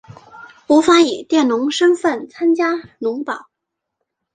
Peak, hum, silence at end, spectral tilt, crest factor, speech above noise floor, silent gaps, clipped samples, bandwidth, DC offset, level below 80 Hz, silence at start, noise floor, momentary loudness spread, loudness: -2 dBFS; none; 0.95 s; -3.5 dB/octave; 16 dB; 64 dB; none; under 0.1%; 9.4 kHz; under 0.1%; -62 dBFS; 0.1 s; -79 dBFS; 12 LU; -16 LUFS